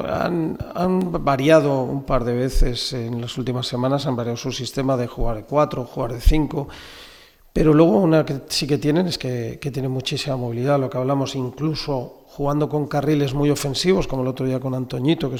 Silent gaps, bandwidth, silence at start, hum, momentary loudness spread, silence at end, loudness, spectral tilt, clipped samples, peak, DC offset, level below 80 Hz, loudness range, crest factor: none; 18 kHz; 0 s; none; 10 LU; 0 s; -21 LUFS; -6 dB/octave; under 0.1%; -2 dBFS; under 0.1%; -30 dBFS; 4 LU; 18 dB